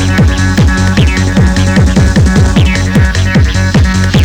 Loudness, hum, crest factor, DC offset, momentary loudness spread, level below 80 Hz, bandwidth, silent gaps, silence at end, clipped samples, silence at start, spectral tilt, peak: -9 LUFS; none; 6 dB; under 0.1%; 1 LU; -14 dBFS; 16.5 kHz; none; 0 s; under 0.1%; 0 s; -6 dB/octave; -2 dBFS